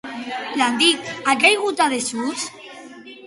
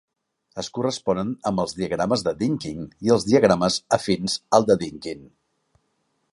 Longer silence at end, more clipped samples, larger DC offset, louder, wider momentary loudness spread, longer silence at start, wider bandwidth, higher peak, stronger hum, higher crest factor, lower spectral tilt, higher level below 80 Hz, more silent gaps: second, 0 s vs 1.05 s; neither; neither; first, -19 LUFS vs -22 LUFS; first, 23 LU vs 15 LU; second, 0.05 s vs 0.55 s; about the same, 11.5 kHz vs 11.5 kHz; about the same, -2 dBFS vs -2 dBFS; neither; about the same, 20 dB vs 22 dB; second, -1.5 dB/octave vs -5 dB/octave; second, -66 dBFS vs -54 dBFS; neither